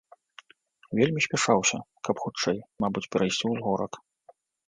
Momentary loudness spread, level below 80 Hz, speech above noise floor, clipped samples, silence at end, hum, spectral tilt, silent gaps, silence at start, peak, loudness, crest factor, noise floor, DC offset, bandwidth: 10 LU; -64 dBFS; 34 dB; under 0.1%; 0.7 s; none; -4 dB/octave; none; 0.9 s; -6 dBFS; -27 LUFS; 22 dB; -61 dBFS; under 0.1%; 10 kHz